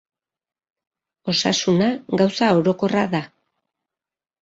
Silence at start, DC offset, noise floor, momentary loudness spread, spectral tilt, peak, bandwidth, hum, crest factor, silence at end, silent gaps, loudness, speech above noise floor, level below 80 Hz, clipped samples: 1.25 s; under 0.1%; -85 dBFS; 6 LU; -5 dB/octave; -4 dBFS; 8 kHz; none; 18 dB; 1.15 s; none; -19 LUFS; 66 dB; -60 dBFS; under 0.1%